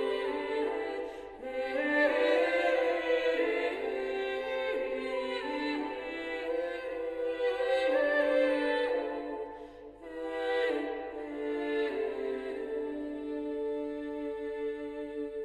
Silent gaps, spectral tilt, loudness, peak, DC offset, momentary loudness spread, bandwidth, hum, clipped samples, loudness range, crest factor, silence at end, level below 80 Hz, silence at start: none; -4 dB/octave; -32 LUFS; -16 dBFS; under 0.1%; 11 LU; 10.5 kHz; none; under 0.1%; 6 LU; 16 dB; 0 s; -64 dBFS; 0 s